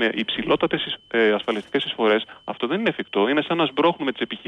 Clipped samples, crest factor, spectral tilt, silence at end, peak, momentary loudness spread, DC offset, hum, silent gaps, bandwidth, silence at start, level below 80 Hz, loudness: under 0.1%; 14 dB; -6.5 dB/octave; 0 s; -8 dBFS; 6 LU; under 0.1%; none; none; 9.4 kHz; 0 s; -60 dBFS; -22 LUFS